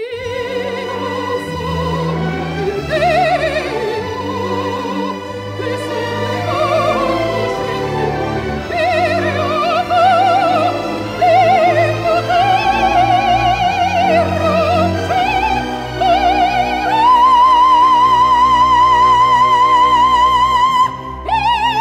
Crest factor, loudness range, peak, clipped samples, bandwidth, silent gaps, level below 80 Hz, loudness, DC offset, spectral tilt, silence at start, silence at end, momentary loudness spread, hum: 10 dB; 8 LU; -2 dBFS; under 0.1%; 15.5 kHz; none; -36 dBFS; -14 LUFS; under 0.1%; -5 dB/octave; 0 s; 0 s; 11 LU; none